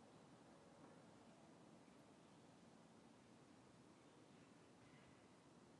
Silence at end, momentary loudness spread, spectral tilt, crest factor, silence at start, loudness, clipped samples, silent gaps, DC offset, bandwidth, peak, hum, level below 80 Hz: 0 s; 2 LU; -5 dB/octave; 16 dB; 0 s; -68 LUFS; under 0.1%; none; under 0.1%; 11 kHz; -52 dBFS; none; under -90 dBFS